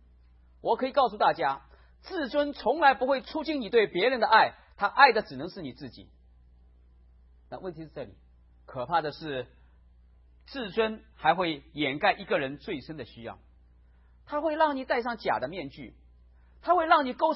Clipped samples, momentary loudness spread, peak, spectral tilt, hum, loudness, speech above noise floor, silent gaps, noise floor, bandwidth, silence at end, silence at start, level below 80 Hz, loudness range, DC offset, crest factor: under 0.1%; 20 LU; -4 dBFS; -8.5 dB/octave; none; -27 LUFS; 30 dB; none; -58 dBFS; 5.8 kHz; 0 s; 0.65 s; -58 dBFS; 12 LU; under 0.1%; 26 dB